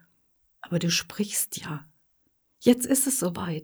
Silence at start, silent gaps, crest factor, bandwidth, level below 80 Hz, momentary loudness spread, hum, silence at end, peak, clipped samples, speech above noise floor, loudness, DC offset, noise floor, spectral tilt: 0.65 s; none; 22 dB; over 20 kHz; -64 dBFS; 12 LU; none; 0 s; -6 dBFS; under 0.1%; 44 dB; -25 LUFS; under 0.1%; -70 dBFS; -3.5 dB/octave